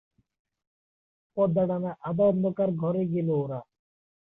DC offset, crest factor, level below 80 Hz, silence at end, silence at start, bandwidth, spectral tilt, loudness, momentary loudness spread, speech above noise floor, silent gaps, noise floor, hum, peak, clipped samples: under 0.1%; 16 dB; -66 dBFS; 0.6 s; 1.35 s; 3.8 kHz; -12.5 dB/octave; -27 LUFS; 9 LU; over 64 dB; none; under -90 dBFS; none; -12 dBFS; under 0.1%